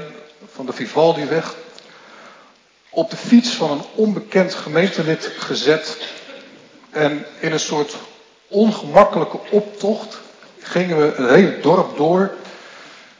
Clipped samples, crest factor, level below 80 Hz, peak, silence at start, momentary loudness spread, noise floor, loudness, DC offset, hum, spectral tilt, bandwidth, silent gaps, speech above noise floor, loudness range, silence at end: under 0.1%; 18 dB; -62 dBFS; 0 dBFS; 0 s; 21 LU; -51 dBFS; -18 LUFS; under 0.1%; none; -5.5 dB/octave; 7.6 kHz; none; 35 dB; 5 LU; 0.25 s